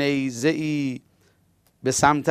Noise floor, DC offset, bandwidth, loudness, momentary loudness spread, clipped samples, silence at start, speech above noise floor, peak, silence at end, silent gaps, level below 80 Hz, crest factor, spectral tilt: -63 dBFS; under 0.1%; 15.5 kHz; -23 LUFS; 11 LU; under 0.1%; 0 s; 41 dB; -2 dBFS; 0 s; none; -56 dBFS; 22 dB; -4.5 dB/octave